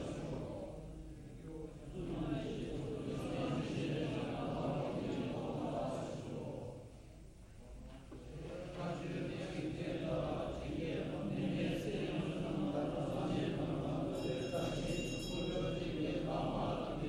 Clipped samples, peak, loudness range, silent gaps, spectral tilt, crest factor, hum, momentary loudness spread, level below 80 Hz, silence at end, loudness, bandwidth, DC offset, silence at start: under 0.1%; -26 dBFS; 7 LU; none; -6.5 dB/octave; 14 dB; none; 13 LU; -54 dBFS; 0 s; -41 LUFS; 16 kHz; under 0.1%; 0 s